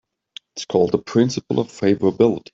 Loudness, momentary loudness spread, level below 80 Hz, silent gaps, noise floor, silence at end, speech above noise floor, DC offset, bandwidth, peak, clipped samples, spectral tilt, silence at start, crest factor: -19 LUFS; 7 LU; -58 dBFS; none; -45 dBFS; 0.15 s; 26 dB; under 0.1%; 8 kHz; -4 dBFS; under 0.1%; -6.5 dB/octave; 0.55 s; 16 dB